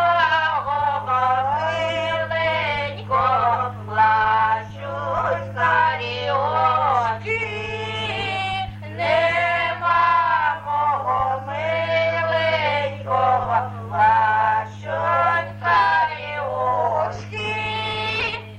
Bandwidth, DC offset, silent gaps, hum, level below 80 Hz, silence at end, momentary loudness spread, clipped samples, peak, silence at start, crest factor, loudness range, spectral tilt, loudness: 9.8 kHz; under 0.1%; none; none; -50 dBFS; 0 s; 8 LU; under 0.1%; -6 dBFS; 0 s; 14 dB; 2 LU; -5 dB/octave; -20 LUFS